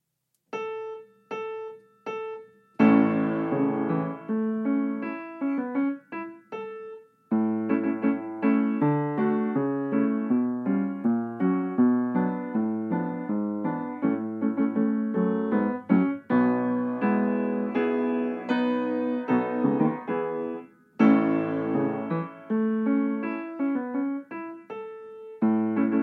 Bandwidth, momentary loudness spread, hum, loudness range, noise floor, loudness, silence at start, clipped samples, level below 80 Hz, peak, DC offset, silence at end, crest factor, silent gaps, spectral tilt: 4.9 kHz; 15 LU; none; 4 LU; -77 dBFS; -26 LUFS; 0.55 s; under 0.1%; -80 dBFS; -8 dBFS; under 0.1%; 0 s; 18 dB; none; -9.5 dB/octave